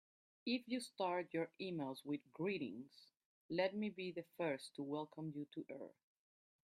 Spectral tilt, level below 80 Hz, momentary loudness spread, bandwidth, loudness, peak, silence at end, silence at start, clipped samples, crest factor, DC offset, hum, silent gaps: -5.5 dB/octave; -88 dBFS; 10 LU; 15.5 kHz; -45 LUFS; -26 dBFS; 0.8 s; 0.45 s; under 0.1%; 20 dB; under 0.1%; none; 3.25-3.49 s